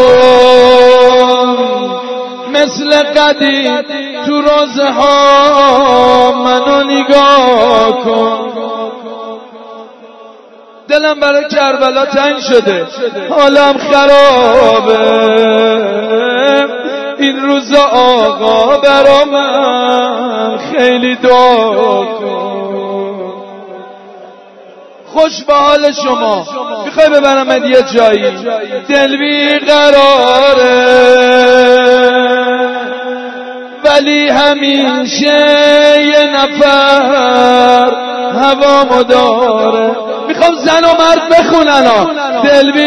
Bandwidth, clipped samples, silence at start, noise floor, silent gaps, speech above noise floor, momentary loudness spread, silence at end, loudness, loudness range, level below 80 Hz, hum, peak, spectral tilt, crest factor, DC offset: 11 kHz; 2%; 0 s; -36 dBFS; none; 29 dB; 12 LU; 0 s; -8 LUFS; 6 LU; -44 dBFS; none; 0 dBFS; -3.5 dB/octave; 8 dB; under 0.1%